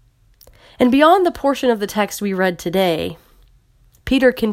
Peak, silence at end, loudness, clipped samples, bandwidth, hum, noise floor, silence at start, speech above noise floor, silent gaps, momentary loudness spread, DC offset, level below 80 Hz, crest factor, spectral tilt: 0 dBFS; 0 s; -17 LUFS; under 0.1%; 16.5 kHz; none; -54 dBFS; 0.8 s; 38 dB; none; 8 LU; under 0.1%; -44 dBFS; 18 dB; -5 dB/octave